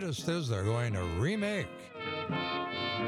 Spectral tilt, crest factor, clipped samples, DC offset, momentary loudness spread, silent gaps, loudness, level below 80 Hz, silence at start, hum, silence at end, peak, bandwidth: -5.5 dB/octave; 14 dB; under 0.1%; under 0.1%; 6 LU; none; -34 LUFS; -60 dBFS; 0 s; none; 0 s; -18 dBFS; 14 kHz